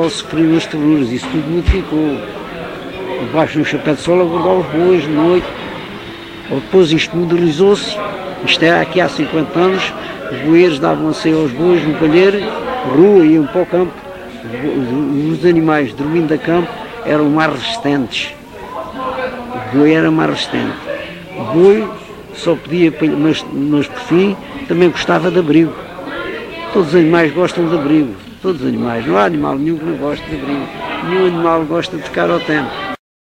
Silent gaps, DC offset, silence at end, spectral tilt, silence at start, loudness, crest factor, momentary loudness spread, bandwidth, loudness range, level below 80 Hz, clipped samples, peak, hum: none; under 0.1%; 0.3 s; -6.5 dB/octave; 0 s; -14 LUFS; 14 dB; 14 LU; 10.5 kHz; 4 LU; -36 dBFS; under 0.1%; 0 dBFS; none